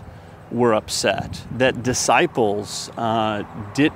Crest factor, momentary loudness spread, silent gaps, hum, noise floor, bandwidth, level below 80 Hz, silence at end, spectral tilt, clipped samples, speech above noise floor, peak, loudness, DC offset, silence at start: 20 dB; 11 LU; none; none; -40 dBFS; 16 kHz; -48 dBFS; 0 s; -4 dB/octave; under 0.1%; 20 dB; -2 dBFS; -21 LUFS; under 0.1%; 0 s